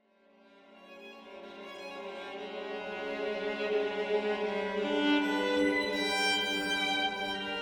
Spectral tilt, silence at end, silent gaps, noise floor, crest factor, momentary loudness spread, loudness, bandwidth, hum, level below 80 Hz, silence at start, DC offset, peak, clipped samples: -3 dB/octave; 0 s; none; -63 dBFS; 16 dB; 18 LU; -31 LUFS; over 20 kHz; none; -66 dBFS; 0.7 s; under 0.1%; -16 dBFS; under 0.1%